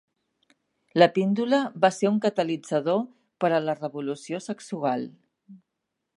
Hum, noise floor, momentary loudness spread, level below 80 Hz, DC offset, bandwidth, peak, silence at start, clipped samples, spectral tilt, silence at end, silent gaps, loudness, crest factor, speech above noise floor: none; -82 dBFS; 13 LU; -80 dBFS; under 0.1%; 11.5 kHz; -2 dBFS; 0.95 s; under 0.1%; -6 dB/octave; 0.6 s; none; -25 LUFS; 24 dB; 58 dB